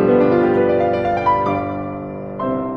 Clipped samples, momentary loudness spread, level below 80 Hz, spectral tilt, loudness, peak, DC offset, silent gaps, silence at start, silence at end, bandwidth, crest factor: under 0.1%; 13 LU; -44 dBFS; -9 dB/octave; -17 LUFS; -4 dBFS; under 0.1%; none; 0 s; 0 s; 6.2 kHz; 14 dB